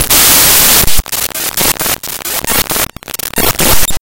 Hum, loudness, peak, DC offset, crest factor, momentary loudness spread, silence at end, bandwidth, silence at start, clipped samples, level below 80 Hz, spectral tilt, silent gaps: none; -8 LUFS; 0 dBFS; under 0.1%; 10 dB; 12 LU; 0 s; over 20 kHz; 0 s; 2%; -26 dBFS; -1 dB/octave; none